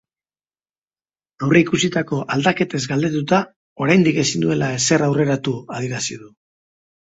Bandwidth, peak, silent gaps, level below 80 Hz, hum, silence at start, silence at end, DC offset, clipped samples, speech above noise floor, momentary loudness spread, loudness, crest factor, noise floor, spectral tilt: 8.2 kHz; 0 dBFS; 3.56-3.76 s; -56 dBFS; none; 1.4 s; 0.75 s; under 0.1%; under 0.1%; over 72 dB; 11 LU; -19 LUFS; 20 dB; under -90 dBFS; -5 dB/octave